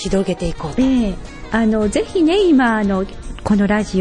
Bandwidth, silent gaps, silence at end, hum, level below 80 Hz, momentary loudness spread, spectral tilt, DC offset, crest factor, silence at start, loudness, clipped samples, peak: 10.5 kHz; none; 0 s; none; -32 dBFS; 10 LU; -6 dB/octave; under 0.1%; 12 dB; 0 s; -17 LUFS; under 0.1%; -4 dBFS